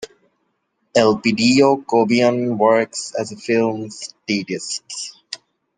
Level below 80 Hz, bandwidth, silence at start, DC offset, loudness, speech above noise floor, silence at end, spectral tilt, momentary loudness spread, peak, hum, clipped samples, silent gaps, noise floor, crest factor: -62 dBFS; 9.8 kHz; 0 s; under 0.1%; -18 LUFS; 52 dB; 0.4 s; -4.5 dB/octave; 16 LU; 0 dBFS; none; under 0.1%; none; -69 dBFS; 18 dB